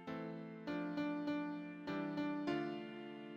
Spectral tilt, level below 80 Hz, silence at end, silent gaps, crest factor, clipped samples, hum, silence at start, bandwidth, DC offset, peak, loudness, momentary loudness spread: -7.5 dB/octave; -80 dBFS; 0 s; none; 16 dB; under 0.1%; none; 0 s; 7 kHz; under 0.1%; -28 dBFS; -43 LUFS; 8 LU